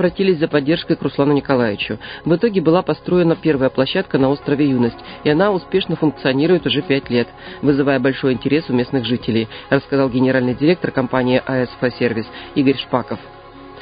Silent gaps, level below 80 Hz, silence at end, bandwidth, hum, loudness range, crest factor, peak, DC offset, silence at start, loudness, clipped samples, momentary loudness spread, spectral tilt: none; -48 dBFS; 0 s; 5.2 kHz; none; 1 LU; 18 dB; 0 dBFS; under 0.1%; 0 s; -17 LUFS; under 0.1%; 6 LU; -11 dB/octave